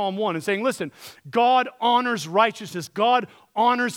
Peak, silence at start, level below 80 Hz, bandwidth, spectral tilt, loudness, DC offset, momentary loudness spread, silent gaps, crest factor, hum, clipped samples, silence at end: -4 dBFS; 0 s; -76 dBFS; 17 kHz; -4 dB/octave; -22 LUFS; under 0.1%; 12 LU; none; 18 dB; none; under 0.1%; 0 s